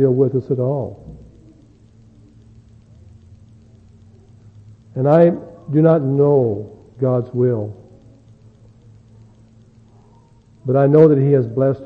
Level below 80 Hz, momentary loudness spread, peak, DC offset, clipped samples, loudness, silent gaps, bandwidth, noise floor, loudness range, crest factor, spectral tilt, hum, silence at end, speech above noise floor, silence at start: -54 dBFS; 19 LU; 0 dBFS; under 0.1%; under 0.1%; -16 LUFS; none; 4.6 kHz; -49 dBFS; 12 LU; 18 dB; -11.5 dB/octave; none; 0 s; 34 dB; 0 s